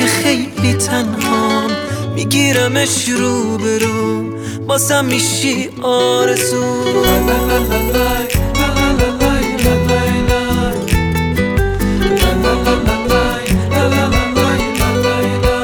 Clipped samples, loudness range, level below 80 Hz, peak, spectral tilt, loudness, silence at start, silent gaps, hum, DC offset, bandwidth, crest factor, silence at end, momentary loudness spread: under 0.1%; 1 LU; -24 dBFS; 0 dBFS; -4.5 dB/octave; -14 LUFS; 0 s; none; none; under 0.1%; over 20 kHz; 14 dB; 0 s; 4 LU